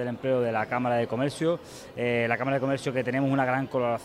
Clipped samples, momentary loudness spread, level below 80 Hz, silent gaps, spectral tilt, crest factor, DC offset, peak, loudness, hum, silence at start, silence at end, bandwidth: under 0.1%; 3 LU; -64 dBFS; none; -6.5 dB/octave; 16 dB; under 0.1%; -10 dBFS; -27 LUFS; none; 0 s; 0 s; 14.5 kHz